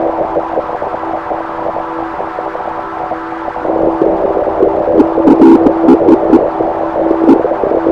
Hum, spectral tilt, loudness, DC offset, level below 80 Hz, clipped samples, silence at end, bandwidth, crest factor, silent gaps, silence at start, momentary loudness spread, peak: none; -8.5 dB/octave; -12 LUFS; under 0.1%; -38 dBFS; 0.6%; 0 s; 5.6 kHz; 10 dB; none; 0 s; 13 LU; 0 dBFS